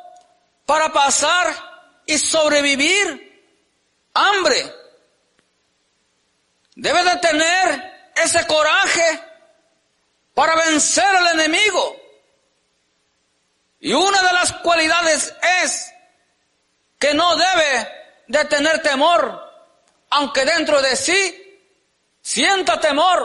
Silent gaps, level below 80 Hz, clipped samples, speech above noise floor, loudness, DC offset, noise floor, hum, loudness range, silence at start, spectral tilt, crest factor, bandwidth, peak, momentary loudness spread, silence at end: none; -58 dBFS; under 0.1%; 49 dB; -16 LUFS; under 0.1%; -66 dBFS; none; 3 LU; 0.05 s; -0.5 dB/octave; 14 dB; 11.5 kHz; -4 dBFS; 11 LU; 0 s